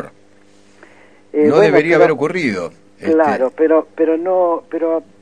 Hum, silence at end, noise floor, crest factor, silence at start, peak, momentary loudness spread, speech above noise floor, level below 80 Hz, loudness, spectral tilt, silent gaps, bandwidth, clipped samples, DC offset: none; 0.2 s; -50 dBFS; 16 dB; 0 s; 0 dBFS; 13 LU; 36 dB; -60 dBFS; -15 LUFS; -6.5 dB/octave; none; 9.8 kHz; under 0.1%; 0.3%